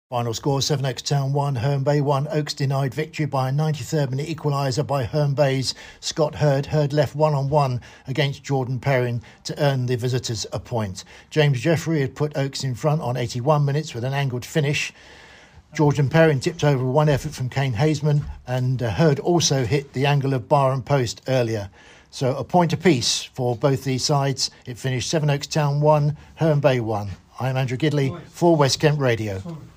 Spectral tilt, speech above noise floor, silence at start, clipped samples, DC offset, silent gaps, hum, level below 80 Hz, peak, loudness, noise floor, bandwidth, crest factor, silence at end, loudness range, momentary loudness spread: -5.5 dB/octave; 26 dB; 0.1 s; under 0.1%; under 0.1%; none; none; -50 dBFS; -4 dBFS; -22 LUFS; -48 dBFS; 15.5 kHz; 18 dB; 0.1 s; 3 LU; 8 LU